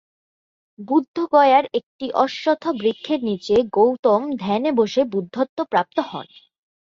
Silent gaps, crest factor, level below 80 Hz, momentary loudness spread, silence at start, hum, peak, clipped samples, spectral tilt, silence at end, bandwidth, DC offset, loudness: 1.08-1.14 s, 1.83-1.99 s, 3.99-4.03 s, 5.49-5.57 s; 18 dB; -60 dBFS; 9 LU; 0.8 s; none; -2 dBFS; under 0.1%; -6 dB/octave; 0.7 s; 7.6 kHz; under 0.1%; -20 LUFS